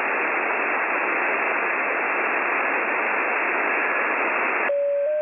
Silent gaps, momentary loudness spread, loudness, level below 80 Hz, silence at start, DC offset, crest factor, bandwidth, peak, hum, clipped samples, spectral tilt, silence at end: none; 1 LU; -22 LUFS; -78 dBFS; 0 s; under 0.1%; 12 dB; 3.7 kHz; -10 dBFS; none; under 0.1%; -6.5 dB/octave; 0 s